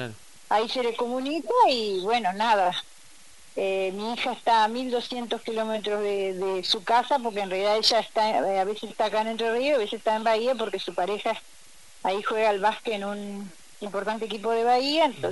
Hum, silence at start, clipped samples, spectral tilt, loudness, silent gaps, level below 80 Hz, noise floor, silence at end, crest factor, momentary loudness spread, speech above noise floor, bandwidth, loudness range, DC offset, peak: none; 0 s; under 0.1%; -3.5 dB/octave; -25 LUFS; none; -68 dBFS; -53 dBFS; 0 s; 20 dB; 9 LU; 28 dB; 11.5 kHz; 3 LU; 0.4%; -6 dBFS